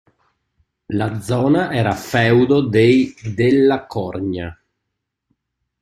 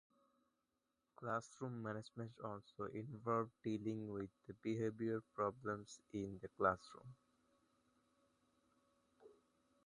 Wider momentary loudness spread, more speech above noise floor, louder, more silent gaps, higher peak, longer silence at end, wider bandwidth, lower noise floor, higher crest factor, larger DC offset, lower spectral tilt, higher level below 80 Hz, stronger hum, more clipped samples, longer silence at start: about the same, 12 LU vs 11 LU; first, 61 dB vs 43 dB; first, -17 LUFS vs -46 LUFS; neither; first, -2 dBFS vs -22 dBFS; first, 1.3 s vs 0.55 s; first, 15.5 kHz vs 11 kHz; second, -78 dBFS vs -88 dBFS; second, 16 dB vs 26 dB; neither; about the same, -7 dB/octave vs -7 dB/octave; first, -50 dBFS vs -76 dBFS; neither; neither; second, 0.9 s vs 1.2 s